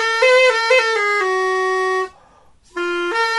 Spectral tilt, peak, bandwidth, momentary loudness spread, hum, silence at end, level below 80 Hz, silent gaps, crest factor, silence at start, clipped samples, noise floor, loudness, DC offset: -1 dB/octave; -2 dBFS; 11.5 kHz; 12 LU; none; 0 s; -60 dBFS; none; 16 dB; 0 s; under 0.1%; -51 dBFS; -16 LUFS; under 0.1%